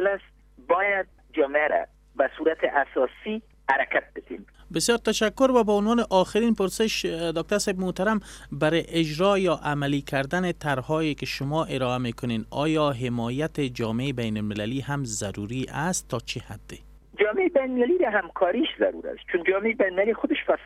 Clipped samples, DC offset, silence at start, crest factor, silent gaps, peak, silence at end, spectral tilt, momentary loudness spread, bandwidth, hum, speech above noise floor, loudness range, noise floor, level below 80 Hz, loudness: under 0.1%; under 0.1%; 0 s; 18 dB; none; -6 dBFS; 0 s; -5 dB/octave; 10 LU; 16 kHz; none; 27 dB; 5 LU; -52 dBFS; -50 dBFS; -25 LUFS